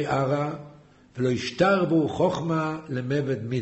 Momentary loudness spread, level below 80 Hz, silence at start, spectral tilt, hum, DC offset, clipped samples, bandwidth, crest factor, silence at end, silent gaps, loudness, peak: 10 LU; -56 dBFS; 0 s; -7 dB/octave; none; under 0.1%; under 0.1%; 8.2 kHz; 16 dB; 0 s; none; -25 LUFS; -8 dBFS